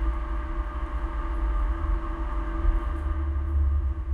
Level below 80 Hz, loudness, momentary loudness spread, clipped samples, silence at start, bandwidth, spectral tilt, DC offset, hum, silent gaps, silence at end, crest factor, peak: -26 dBFS; -30 LUFS; 6 LU; under 0.1%; 0 s; 3.8 kHz; -9 dB/octave; under 0.1%; none; none; 0 s; 14 dB; -12 dBFS